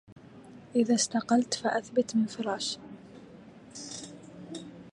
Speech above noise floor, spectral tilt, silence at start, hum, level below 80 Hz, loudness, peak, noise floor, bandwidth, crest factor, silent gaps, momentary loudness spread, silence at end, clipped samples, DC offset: 23 dB; -3.5 dB/octave; 0.1 s; none; -70 dBFS; -29 LUFS; -12 dBFS; -51 dBFS; 11.5 kHz; 20 dB; 0.12-0.16 s; 24 LU; 0.05 s; under 0.1%; under 0.1%